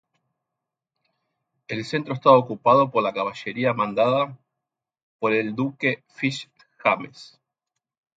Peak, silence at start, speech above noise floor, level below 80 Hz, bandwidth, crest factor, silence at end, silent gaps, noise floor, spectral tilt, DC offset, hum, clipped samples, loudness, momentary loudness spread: -2 dBFS; 1.7 s; 64 dB; -70 dBFS; 8.6 kHz; 22 dB; 0.9 s; 5.03-5.19 s; -86 dBFS; -6.5 dB/octave; under 0.1%; none; under 0.1%; -22 LUFS; 11 LU